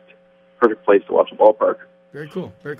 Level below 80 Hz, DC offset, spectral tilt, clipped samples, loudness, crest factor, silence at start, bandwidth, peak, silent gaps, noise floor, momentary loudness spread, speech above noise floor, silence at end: -70 dBFS; under 0.1%; -8 dB/octave; under 0.1%; -17 LUFS; 18 dB; 0.6 s; 4.8 kHz; 0 dBFS; none; -52 dBFS; 17 LU; 35 dB; 0.05 s